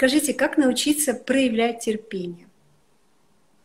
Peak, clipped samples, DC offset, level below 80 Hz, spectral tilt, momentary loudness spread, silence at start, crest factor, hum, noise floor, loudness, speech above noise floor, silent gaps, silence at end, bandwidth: -6 dBFS; under 0.1%; under 0.1%; -60 dBFS; -3 dB/octave; 12 LU; 0 s; 16 dB; none; -64 dBFS; -22 LUFS; 43 dB; none; 1.3 s; 16 kHz